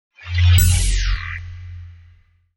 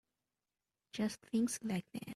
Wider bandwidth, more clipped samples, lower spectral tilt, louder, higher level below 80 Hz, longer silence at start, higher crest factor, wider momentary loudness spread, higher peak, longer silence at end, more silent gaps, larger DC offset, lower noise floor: first, 18.5 kHz vs 13 kHz; neither; second, -3 dB/octave vs -5 dB/octave; first, -18 LUFS vs -38 LUFS; first, -24 dBFS vs -76 dBFS; second, 0.25 s vs 0.95 s; about the same, 16 dB vs 16 dB; first, 22 LU vs 6 LU; first, -2 dBFS vs -24 dBFS; first, 0.65 s vs 0 s; neither; neither; second, -52 dBFS vs under -90 dBFS